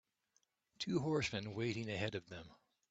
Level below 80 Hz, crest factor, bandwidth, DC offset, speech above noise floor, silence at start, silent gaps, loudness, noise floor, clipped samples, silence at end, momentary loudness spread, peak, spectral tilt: -72 dBFS; 18 dB; 9 kHz; under 0.1%; 41 dB; 0.8 s; none; -41 LUFS; -81 dBFS; under 0.1%; 0.35 s; 12 LU; -24 dBFS; -5.5 dB/octave